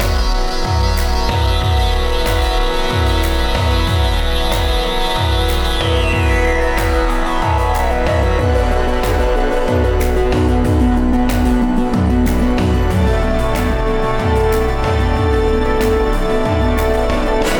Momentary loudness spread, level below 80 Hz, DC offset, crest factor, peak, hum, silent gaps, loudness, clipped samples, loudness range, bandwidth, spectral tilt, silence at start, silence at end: 2 LU; -18 dBFS; under 0.1%; 12 dB; -2 dBFS; none; none; -16 LUFS; under 0.1%; 1 LU; over 20 kHz; -6 dB/octave; 0 s; 0 s